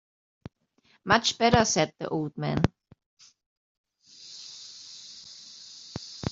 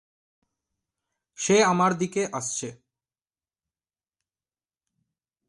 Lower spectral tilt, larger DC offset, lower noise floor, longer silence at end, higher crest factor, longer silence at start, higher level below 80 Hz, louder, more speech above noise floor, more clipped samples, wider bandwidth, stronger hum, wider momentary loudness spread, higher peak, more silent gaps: about the same, -4 dB/octave vs -4 dB/octave; neither; second, -66 dBFS vs under -90 dBFS; second, 0 s vs 2.75 s; first, 28 dB vs 22 dB; second, 1.05 s vs 1.4 s; first, -52 dBFS vs -72 dBFS; about the same, -25 LUFS vs -24 LUFS; second, 41 dB vs over 66 dB; neither; second, 8 kHz vs 11.5 kHz; neither; first, 22 LU vs 12 LU; first, -4 dBFS vs -8 dBFS; first, 3.06-3.17 s, 3.46-3.84 s vs none